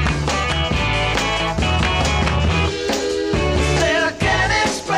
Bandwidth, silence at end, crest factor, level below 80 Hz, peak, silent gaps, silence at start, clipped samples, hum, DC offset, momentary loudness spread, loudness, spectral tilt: 15.5 kHz; 0 s; 14 dB; -26 dBFS; -4 dBFS; none; 0 s; under 0.1%; none; 0.1%; 3 LU; -18 LUFS; -4.5 dB/octave